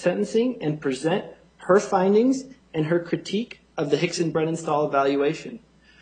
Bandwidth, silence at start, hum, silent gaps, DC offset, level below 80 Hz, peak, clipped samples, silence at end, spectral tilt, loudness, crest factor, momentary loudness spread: 9.4 kHz; 0 s; none; none; under 0.1%; -64 dBFS; -4 dBFS; under 0.1%; 0.45 s; -6 dB/octave; -24 LUFS; 20 dB; 12 LU